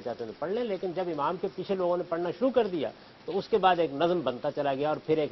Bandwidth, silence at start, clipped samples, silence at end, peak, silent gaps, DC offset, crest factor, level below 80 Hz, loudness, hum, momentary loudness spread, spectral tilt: 6 kHz; 0 s; under 0.1%; 0 s; -10 dBFS; none; under 0.1%; 18 dB; -66 dBFS; -29 LUFS; none; 9 LU; -7.5 dB/octave